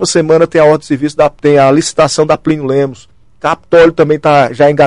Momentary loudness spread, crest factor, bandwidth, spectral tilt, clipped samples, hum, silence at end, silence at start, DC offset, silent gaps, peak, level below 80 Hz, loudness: 8 LU; 10 dB; 11 kHz; -5 dB/octave; under 0.1%; none; 0 s; 0 s; 0.7%; none; 0 dBFS; -42 dBFS; -10 LUFS